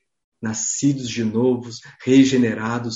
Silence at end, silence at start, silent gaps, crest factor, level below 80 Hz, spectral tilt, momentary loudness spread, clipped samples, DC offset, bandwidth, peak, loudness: 0 s; 0.4 s; none; 18 dB; -58 dBFS; -5 dB/octave; 14 LU; under 0.1%; under 0.1%; 8 kHz; -2 dBFS; -19 LUFS